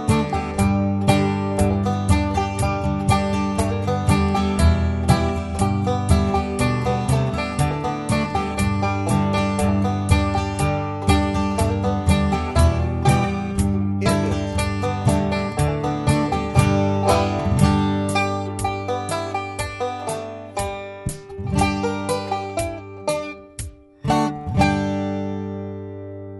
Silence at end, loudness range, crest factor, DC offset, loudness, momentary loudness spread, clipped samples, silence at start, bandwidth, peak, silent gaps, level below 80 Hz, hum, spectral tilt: 0 s; 5 LU; 18 dB; under 0.1%; -21 LUFS; 9 LU; under 0.1%; 0 s; 12 kHz; -2 dBFS; none; -30 dBFS; none; -6 dB/octave